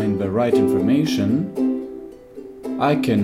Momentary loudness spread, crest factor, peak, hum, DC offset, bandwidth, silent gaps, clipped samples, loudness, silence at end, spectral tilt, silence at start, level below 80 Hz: 20 LU; 14 dB; -6 dBFS; none; under 0.1%; 15 kHz; none; under 0.1%; -20 LUFS; 0 s; -7 dB/octave; 0 s; -56 dBFS